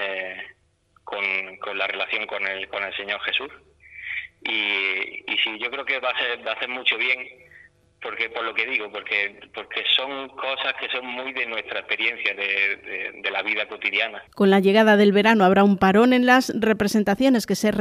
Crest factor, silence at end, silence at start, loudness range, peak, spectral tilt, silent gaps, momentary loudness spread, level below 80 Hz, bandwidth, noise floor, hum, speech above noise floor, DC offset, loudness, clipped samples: 18 dB; 0 s; 0 s; 9 LU; -4 dBFS; -5 dB/octave; none; 14 LU; -60 dBFS; 15.5 kHz; -62 dBFS; none; 40 dB; under 0.1%; -22 LUFS; under 0.1%